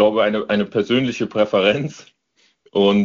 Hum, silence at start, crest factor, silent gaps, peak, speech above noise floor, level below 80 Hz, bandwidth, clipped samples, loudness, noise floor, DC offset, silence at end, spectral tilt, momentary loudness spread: none; 0 s; 16 dB; none; -2 dBFS; 44 dB; -56 dBFS; 7.4 kHz; under 0.1%; -19 LUFS; -62 dBFS; under 0.1%; 0 s; -4 dB/octave; 7 LU